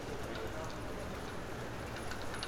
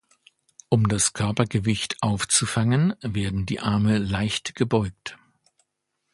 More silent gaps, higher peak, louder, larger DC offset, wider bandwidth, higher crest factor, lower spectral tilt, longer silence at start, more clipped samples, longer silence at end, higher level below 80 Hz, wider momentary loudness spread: neither; second, -20 dBFS vs -2 dBFS; second, -43 LUFS vs -23 LUFS; neither; first, 18.5 kHz vs 11.5 kHz; about the same, 20 dB vs 22 dB; about the same, -4.5 dB/octave vs -4.5 dB/octave; second, 0 s vs 0.7 s; neither; second, 0 s vs 1 s; second, -52 dBFS vs -46 dBFS; second, 2 LU vs 6 LU